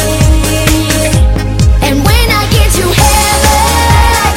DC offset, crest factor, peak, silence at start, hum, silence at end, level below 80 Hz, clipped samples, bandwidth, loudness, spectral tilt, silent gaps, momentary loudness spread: under 0.1%; 8 dB; 0 dBFS; 0 s; none; 0 s; -12 dBFS; 0.7%; 17 kHz; -8 LUFS; -4 dB/octave; none; 3 LU